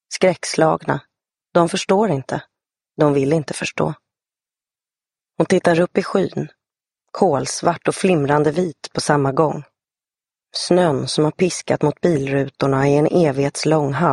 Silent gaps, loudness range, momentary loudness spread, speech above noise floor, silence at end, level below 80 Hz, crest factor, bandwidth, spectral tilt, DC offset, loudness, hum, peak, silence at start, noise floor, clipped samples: none; 4 LU; 9 LU; over 72 dB; 0 s; -56 dBFS; 18 dB; 11.5 kHz; -5.5 dB/octave; under 0.1%; -18 LUFS; none; -2 dBFS; 0.1 s; under -90 dBFS; under 0.1%